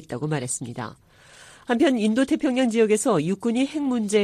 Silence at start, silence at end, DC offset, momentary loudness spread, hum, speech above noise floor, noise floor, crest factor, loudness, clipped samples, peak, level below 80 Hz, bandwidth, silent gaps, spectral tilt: 0.1 s; 0 s; under 0.1%; 12 LU; none; 27 dB; -49 dBFS; 16 dB; -23 LUFS; under 0.1%; -8 dBFS; -62 dBFS; 14.5 kHz; none; -5 dB/octave